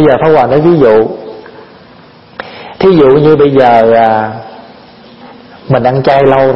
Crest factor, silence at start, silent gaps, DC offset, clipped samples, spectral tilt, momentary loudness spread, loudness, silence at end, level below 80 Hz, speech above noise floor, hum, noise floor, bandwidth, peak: 8 dB; 0 s; none; under 0.1%; 0.7%; -9 dB/octave; 20 LU; -7 LUFS; 0 s; -40 dBFS; 31 dB; none; -37 dBFS; 5.8 kHz; 0 dBFS